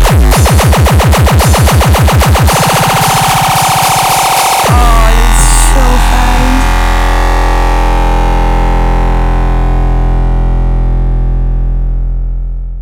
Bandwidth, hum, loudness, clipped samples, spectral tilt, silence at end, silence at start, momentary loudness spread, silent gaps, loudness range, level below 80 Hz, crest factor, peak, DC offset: 17.5 kHz; none; -9 LUFS; under 0.1%; -4.5 dB/octave; 0 s; 0 s; 7 LU; none; 6 LU; -10 dBFS; 6 dB; 0 dBFS; under 0.1%